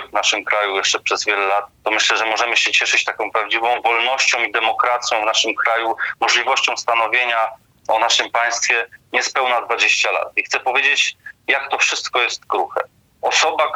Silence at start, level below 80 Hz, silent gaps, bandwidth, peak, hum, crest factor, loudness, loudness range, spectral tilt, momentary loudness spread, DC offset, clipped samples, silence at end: 0 s; -66 dBFS; none; 16.5 kHz; -2 dBFS; none; 16 dB; -17 LUFS; 1 LU; 1 dB/octave; 6 LU; under 0.1%; under 0.1%; 0 s